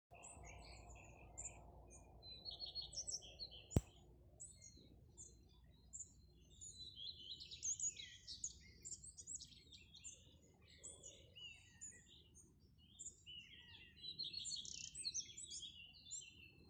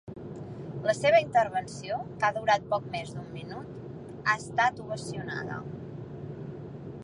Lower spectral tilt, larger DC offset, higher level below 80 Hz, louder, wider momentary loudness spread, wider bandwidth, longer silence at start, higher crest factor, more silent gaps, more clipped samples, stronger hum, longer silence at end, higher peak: second, -2 dB/octave vs -5 dB/octave; neither; second, -66 dBFS vs -60 dBFS; second, -51 LUFS vs -29 LUFS; about the same, 20 LU vs 18 LU; first, 13.5 kHz vs 11 kHz; about the same, 0.1 s vs 0.05 s; first, 34 dB vs 20 dB; neither; neither; neither; about the same, 0 s vs 0 s; second, -20 dBFS vs -12 dBFS